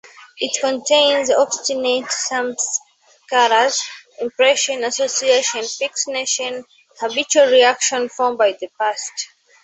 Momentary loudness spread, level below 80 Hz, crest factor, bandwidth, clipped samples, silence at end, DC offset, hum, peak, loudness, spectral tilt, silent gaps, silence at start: 12 LU; -70 dBFS; 18 dB; 8.4 kHz; under 0.1%; 0.4 s; under 0.1%; none; -2 dBFS; -17 LUFS; 0.5 dB/octave; none; 0.2 s